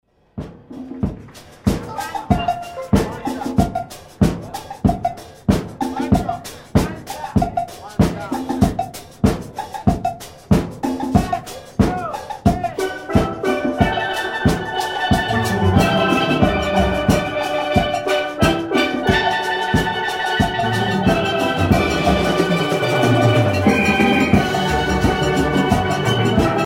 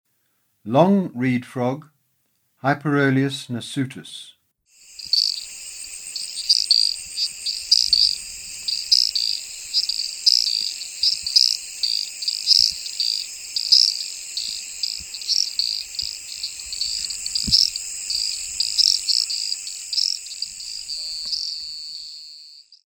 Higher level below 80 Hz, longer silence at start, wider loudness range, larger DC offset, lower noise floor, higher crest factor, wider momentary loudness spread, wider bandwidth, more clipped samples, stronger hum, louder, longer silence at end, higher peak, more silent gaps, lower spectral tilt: first, -32 dBFS vs -56 dBFS; second, 0.35 s vs 0.65 s; about the same, 6 LU vs 7 LU; neither; second, -40 dBFS vs -68 dBFS; second, 18 dB vs 24 dB; second, 11 LU vs 14 LU; second, 16 kHz vs 19 kHz; neither; neither; about the same, -19 LUFS vs -20 LUFS; second, 0 s vs 0.15 s; about the same, 0 dBFS vs 0 dBFS; neither; first, -6 dB/octave vs -2.5 dB/octave